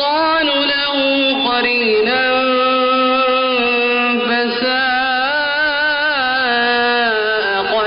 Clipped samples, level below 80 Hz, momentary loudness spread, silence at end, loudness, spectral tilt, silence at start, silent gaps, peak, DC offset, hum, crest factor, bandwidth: under 0.1%; -52 dBFS; 2 LU; 0 s; -14 LUFS; 1 dB/octave; 0 s; none; -6 dBFS; under 0.1%; none; 8 dB; 5.4 kHz